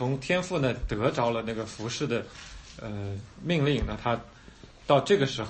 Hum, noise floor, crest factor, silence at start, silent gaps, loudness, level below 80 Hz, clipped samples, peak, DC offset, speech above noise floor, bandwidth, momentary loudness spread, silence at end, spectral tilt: none; -50 dBFS; 20 dB; 0 s; none; -28 LUFS; -46 dBFS; under 0.1%; -8 dBFS; under 0.1%; 22 dB; 8.8 kHz; 15 LU; 0 s; -5.5 dB/octave